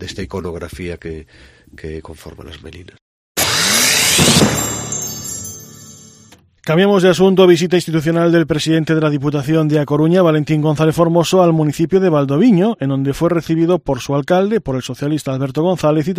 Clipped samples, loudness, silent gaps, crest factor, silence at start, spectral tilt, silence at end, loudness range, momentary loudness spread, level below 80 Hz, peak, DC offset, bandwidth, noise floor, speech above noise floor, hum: under 0.1%; -14 LUFS; 3.01-3.35 s; 16 dB; 0 s; -4.5 dB/octave; 0 s; 4 LU; 19 LU; -42 dBFS; 0 dBFS; under 0.1%; 15.5 kHz; -46 dBFS; 32 dB; none